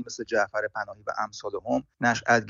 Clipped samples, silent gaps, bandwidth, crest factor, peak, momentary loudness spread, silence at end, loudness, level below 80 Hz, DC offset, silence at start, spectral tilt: under 0.1%; none; 7.6 kHz; 20 dB; -8 dBFS; 8 LU; 0 s; -28 LUFS; -64 dBFS; under 0.1%; 0 s; -3 dB/octave